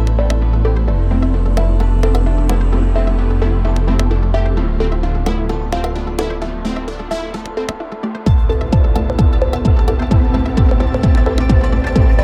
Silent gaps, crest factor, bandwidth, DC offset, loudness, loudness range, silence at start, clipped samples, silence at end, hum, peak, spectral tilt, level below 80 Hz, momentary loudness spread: none; 12 dB; 9.2 kHz; under 0.1%; -16 LUFS; 6 LU; 0 s; under 0.1%; 0 s; none; -2 dBFS; -7.5 dB/octave; -14 dBFS; 9 LU